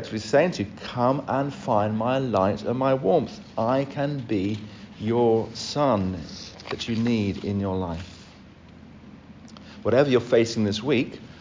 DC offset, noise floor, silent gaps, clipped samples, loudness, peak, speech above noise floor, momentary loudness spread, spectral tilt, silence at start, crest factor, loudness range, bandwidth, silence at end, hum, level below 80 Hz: under 0.1%; -47 dBFS; none; under 0.1%; -25 LUFS; -6 dBFS; 24 dB; 12 LU; -6.5 dB/octave; 0 s; 18 dB; 5 LU; 7.6 kHz; 0 s; none; -50 dBFS